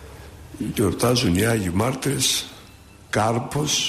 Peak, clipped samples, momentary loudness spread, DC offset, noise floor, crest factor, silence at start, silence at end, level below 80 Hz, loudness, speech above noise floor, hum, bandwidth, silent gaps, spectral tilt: -8 dBFS; under 0.1%; 17 LU; under 0.1%; -46 dBFS; 14 dB; 0 s; 0 s; -46 dBFS; -22 LUFS; 25 dB; none; 15.5 kHz; none; -4 dB/octave